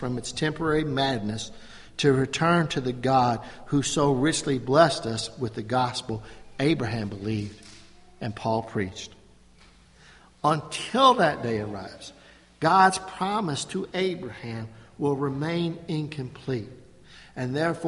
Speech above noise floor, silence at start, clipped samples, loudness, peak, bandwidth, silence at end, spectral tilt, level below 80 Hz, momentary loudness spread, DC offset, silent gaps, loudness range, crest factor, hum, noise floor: 29 dB; 0 s; under 0.1%; -26 LUFS; -4 dBFS; 11.5 kHz; 0 s; -5 dB/octave; -54 dBFS; 16 LU; under 0.1%; none; 8 LU; 22 dB; none; -54 dBFS